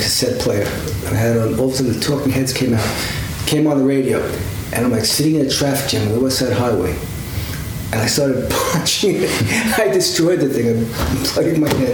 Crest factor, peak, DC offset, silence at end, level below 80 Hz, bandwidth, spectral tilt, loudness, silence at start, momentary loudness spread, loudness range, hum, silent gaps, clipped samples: 16 dB; -2 dBFS; under 0.1%; 0 s; -34 dBFS; over 20 kHz; -4.5 dB/octave; -17 LUFS; 0 s; 7 LU; 2 LU; none; none; under 0.1%